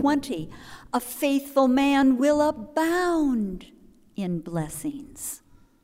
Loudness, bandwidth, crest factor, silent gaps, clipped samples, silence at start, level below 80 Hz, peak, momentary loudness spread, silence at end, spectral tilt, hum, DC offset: -25 LUFS; 16 kHz; 16 dB; none; under 0.1%; 0 s; -52 dBFS; -8 dBFS; 15 LU; 0.45 s; -5 dB/octave; none; under 0.1%